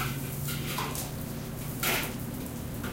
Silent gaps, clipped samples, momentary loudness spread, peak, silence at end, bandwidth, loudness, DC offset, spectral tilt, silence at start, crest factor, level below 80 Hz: none; under 0.1%; 9 LU; -16 dBFS; 0 s; 17 kHz; -33 LUFS; under 0.1%; -4 dB/octave; 0 s; 18 dB; -46 dBFS